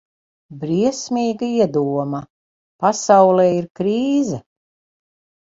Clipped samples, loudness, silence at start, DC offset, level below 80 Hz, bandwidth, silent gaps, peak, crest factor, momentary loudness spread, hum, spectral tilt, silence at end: under 0.1%; -18 LUFS; 0.5 s; under 0.1%; -60 dBFS; 7.8 kHz; 2.30-2.79 s, 3.70-3.75 s; 0 dBFS; 18 dB; 12 LU; none; -6 dB/octave; 1.1 s